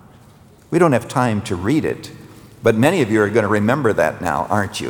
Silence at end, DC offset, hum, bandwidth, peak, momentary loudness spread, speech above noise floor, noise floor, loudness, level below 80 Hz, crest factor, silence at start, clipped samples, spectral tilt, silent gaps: 0 s; under 0.1%; none; over 20 kHz; -2 dBFS; 7 LU; 29 dB; -46 dBFS; -18 LUFS; -52 dBFS; 16 dB; 0.7 s; under 0.1%; -6 dB/octave; none